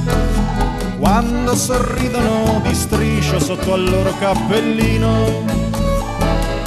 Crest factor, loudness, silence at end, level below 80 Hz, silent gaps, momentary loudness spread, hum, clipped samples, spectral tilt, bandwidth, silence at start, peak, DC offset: 14 dB; -17 LUFS; 0 s; -24 dBFS; none; 3 LU; none; under 0.1%; -5.5 dB/octave; 13 kHz; 0 s; -2 dBFS; under 0.1%